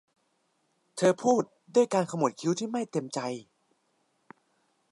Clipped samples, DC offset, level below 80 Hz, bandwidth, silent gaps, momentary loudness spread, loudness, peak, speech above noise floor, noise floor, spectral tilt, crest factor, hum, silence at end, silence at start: under 0.1%; under 0.1%; -82 dBFS; 11.5 kHz; none; 10 LU; -28 LUFS; -10 dBFS; 46 dB; -74 dBFS; -5.5 dB/octave; 20 dB; none; 1.5 s; 0.95 s